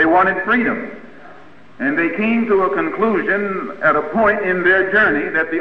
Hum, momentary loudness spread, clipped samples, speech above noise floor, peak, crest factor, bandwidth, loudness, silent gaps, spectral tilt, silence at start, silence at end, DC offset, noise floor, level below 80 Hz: none; 7 LU; under 0.1%; 27 dB; -2 dBFS; 14 dB; 6 kHz; -16 LUFS; none; -8 dB/octave; 0 s; 0 s; 1%; -43 dBFS; -50 dBFS